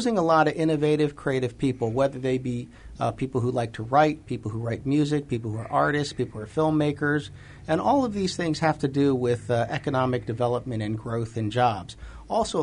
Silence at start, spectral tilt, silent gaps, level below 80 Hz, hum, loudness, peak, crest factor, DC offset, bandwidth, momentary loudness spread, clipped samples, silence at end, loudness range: 0 s; -6.5 dB/octave; none; -50 dBFS; none; -25 LUFS; -8 dBFS; 18 dB; under 0.1%; 10.5 kHz; 9 LU; under 0.1%; 0 s; 2 LU